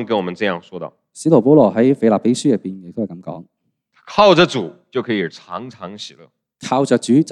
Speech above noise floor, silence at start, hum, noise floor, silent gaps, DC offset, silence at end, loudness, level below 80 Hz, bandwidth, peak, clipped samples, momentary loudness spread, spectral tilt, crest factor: 45 dB; 0 s; none; -61 dBFS; none; under 0.1%; 0 s; -16 LUFS; -60 dBFS; 11.5 kHz; 0 dBFS; under 0.1%; 21 LU; -6 dB/octave; 16 dB